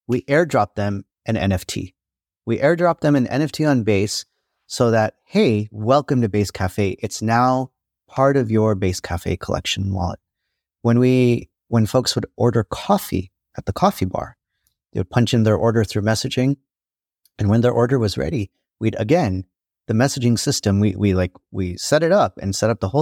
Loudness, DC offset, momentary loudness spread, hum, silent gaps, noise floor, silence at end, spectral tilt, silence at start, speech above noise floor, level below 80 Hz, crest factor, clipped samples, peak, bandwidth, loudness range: -20 LUFS; under 0.1%; 10 LU; none; none; under -90 dBFS; 0 s; -6 dB/octave; 0.1 s; over 71 dB; -46 dBFS; 18 dB; under 0.1%; -2 dBFS; 17.5 kHz; 2 LU